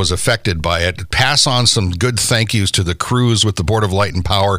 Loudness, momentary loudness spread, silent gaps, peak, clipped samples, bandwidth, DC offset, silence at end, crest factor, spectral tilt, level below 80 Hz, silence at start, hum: -14 LUFS; 6 LU; none; 0 dBFS; under 0.1%; 16 kHz; under 0.1%; 0 s; 14 dB; -3.5 dB/octave; -32 dBFS; 0 s; none